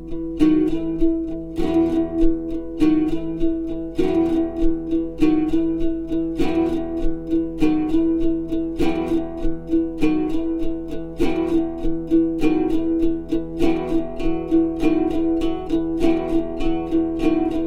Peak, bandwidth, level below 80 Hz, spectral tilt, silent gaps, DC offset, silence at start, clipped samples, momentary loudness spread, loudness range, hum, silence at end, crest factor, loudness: -4 dBFS; 7.2 kHz; -30 dBFS; -8 dB/octave; none; under 0.1%; 0 s; under 0.1%; 6 LU; 2 LU; none; 0 s; 16 dB; -22 LUFS